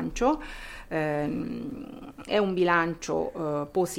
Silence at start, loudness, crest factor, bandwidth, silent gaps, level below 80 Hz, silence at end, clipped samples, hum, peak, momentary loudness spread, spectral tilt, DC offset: 0 s; -28 LUFS; 18 dB; 16.5 kHz; none; -48 dBFS; 0 s; under 0.1%; none; -10 dBFS; 17 LU; -5.5 dB/octave; under 0.1%